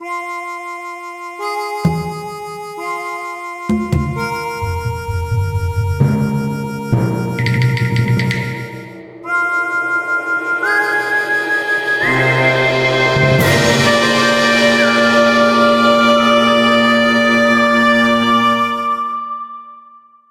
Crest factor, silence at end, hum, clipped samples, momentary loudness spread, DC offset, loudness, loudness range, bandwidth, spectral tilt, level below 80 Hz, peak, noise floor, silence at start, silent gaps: 14 dB; 0.5 s; none; under 0.1%; 14 LU; under 0.1%; -14 LUFS; 10 LU; 16 kHz; -5 dB/octave; -38 dBFS; 0 dBFS; -44 dBFS; 0 s; none